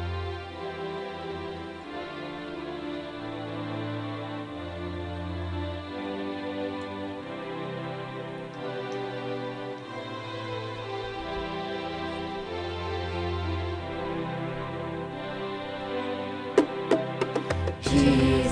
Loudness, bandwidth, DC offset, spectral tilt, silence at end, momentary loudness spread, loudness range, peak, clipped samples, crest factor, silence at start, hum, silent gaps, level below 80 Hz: -32 LUFS; 10.5 kHz; under 0.1%; -6 dB/octave; 0 s; 10 LU; 6 LU; -6 dBFS; under 0.1%; 24 dB; 0 s; none; none; -46 dBFS